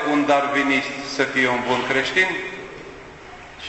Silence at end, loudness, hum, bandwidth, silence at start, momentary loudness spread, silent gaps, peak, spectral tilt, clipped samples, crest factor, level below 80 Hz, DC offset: 0 s; -20 LUFS; none; 8.4 kHz; 0 s; 21 LU; none; -4 dBFS; -4 dB/octave; under 0.1%; 18 dB; -54 dBFS; under 0.1%